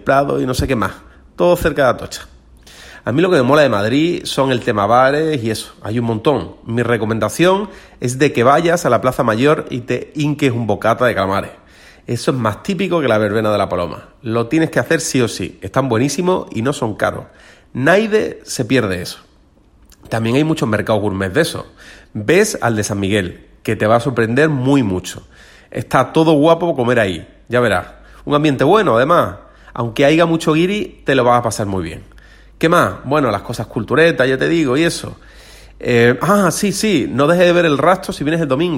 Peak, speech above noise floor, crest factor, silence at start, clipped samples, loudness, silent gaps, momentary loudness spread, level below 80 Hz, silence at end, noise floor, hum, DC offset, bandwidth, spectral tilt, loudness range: 0 dBFS; 35 dB; 16 dB; 0.05 s; under 0.1%; -15 LUFS; none; 12 LU; -42 dBFS; 0 s; -50 dBFS; none; under 0.1%; 16.5 kHz; -5.5 dB/octave; 4 LU